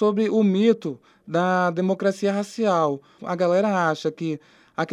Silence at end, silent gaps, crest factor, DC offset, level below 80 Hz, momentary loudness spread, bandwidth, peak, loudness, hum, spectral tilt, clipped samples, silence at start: 0 s; none; 16 dB; under 0.1%; -74 dBFS; 12 LU; 11.5 kHz; -6 dBFS; -22 LUFS; none; -6.5 dB/octave; under 0.1%; 0 s